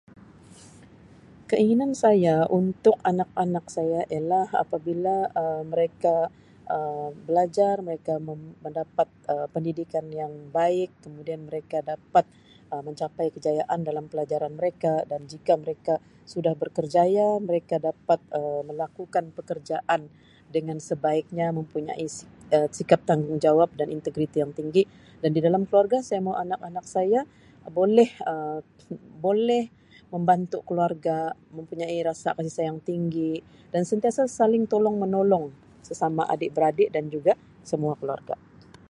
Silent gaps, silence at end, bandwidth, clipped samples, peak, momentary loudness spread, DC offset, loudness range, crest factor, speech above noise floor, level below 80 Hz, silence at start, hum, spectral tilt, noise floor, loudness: none; 0.55 s; 11.5 kHz; under 0.1%; -4 dBFS; 12 LU; under 0.1%; 5 LU; 22 dB; 26 dB; -66 dBFS; 1.5 s; none; -7 dB/octave; -51 dBFS; -26 LUFS